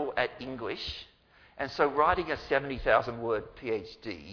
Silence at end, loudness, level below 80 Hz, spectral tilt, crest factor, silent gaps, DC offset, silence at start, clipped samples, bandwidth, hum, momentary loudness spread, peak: 0 s; -30 LUFS; -50 dBFS; -6 dB/octave; 22 dB; none; under 0.1%; 0 s; under 0.1%; 5.4 kHz; none; 12 LU; -10 dBFS